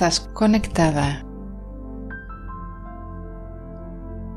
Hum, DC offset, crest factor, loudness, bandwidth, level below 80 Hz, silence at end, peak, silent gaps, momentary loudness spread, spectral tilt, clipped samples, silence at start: 50 Hz at -45 dBFS; under 0.1%; 20 dB; -22 LUFS; 12.5 kHz; -36 dBFS; 0 s; -4 dBFS; none; 18 LU; -5 dB/octave; under 0.1%; 0 s